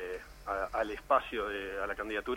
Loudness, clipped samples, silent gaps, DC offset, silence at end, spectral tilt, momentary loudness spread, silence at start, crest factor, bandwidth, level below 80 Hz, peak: -34 LUFS; under 0.1%; none; under 0.1%; 0 s; -4.5 dB/octave; 9 LU; 0 s; 20 dB; 17 kHz; -54 dBFS; -14 dBFS